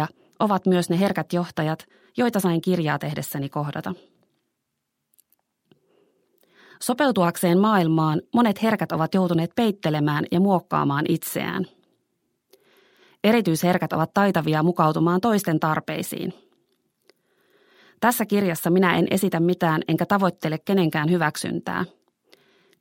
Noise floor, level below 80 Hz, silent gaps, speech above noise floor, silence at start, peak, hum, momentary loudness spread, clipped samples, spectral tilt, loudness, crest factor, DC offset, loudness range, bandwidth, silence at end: -79 dBFS; -66 dBFS; none; 57 dB; 0 s; -2 dBFS; none; 9 LU; under 0.1%; -6 dB/octave; -22 LUFS; 20 dB; under 0.1%; 7 LU; 16.5 kHz; 0.95 s